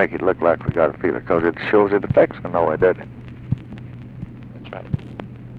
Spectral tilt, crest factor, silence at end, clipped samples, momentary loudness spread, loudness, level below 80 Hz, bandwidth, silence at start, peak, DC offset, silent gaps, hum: -9.5 dB/octave; 18 dB; 0 s; under 0.1%; 19 LU; -20 LUFS; -44 dBFS; 5 kHz; 0 s; -2 dBFS; under 0.1%; none; none